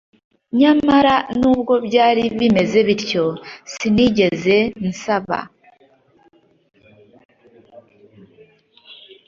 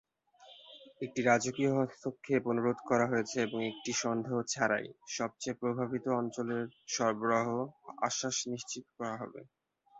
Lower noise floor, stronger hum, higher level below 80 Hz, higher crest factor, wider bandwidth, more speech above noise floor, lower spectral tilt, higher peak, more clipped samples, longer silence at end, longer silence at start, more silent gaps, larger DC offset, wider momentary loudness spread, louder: second, -55 dBFS vs -60 dBFS; neither; first, -50 dBFS vs -74 dBFS; about the same, 16 dB vs 20 dB; about the same, 7.6 kHz vs 8.2 kHz; first, 40 dB vs 27 dB; first, -5.5 dB/octave vs -4 dB/octave; first, -2 dBFS vs -14 dBFS; neither; first, 0.35 s vs 0 s; first, 0.55 s vs 0.4 s; first, 7.25-7.29 s vs none; neither; about the same, 11 LU vs 12 LU; first, -16 LUFS vs -34 LUFS